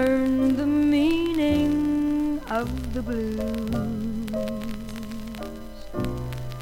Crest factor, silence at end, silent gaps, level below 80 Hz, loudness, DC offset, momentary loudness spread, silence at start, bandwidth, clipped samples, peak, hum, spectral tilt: 14 dB; 0 s; none; -40 dBFS; -25 LUFS; under 0.1%; 14 LU; 0 s; 16.5 kHz; under 0.1%; -12 dBFS; none; -7 dB/octave